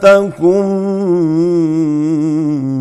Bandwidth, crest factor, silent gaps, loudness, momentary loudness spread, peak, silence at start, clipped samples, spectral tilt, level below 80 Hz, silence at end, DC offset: 11 kHz; 12 dB; none; -13 LUFS; 5 LU; 0 dBFS; 0 s; under 0.1%; -8 dB/octave; -54 dBFS; 0 s; under 0.1%